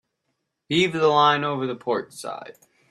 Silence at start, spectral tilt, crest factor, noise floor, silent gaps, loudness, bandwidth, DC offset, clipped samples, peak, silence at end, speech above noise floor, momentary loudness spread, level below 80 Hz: 0.7 s; -5 dB/octave; 18 dB; -77 dBFS; none; -21 LUFS; 13 kHz; under 0.1%; under 0.1%; -6 dBFS; 0.4 s; 55 dB; 17 LU; -66 dBFS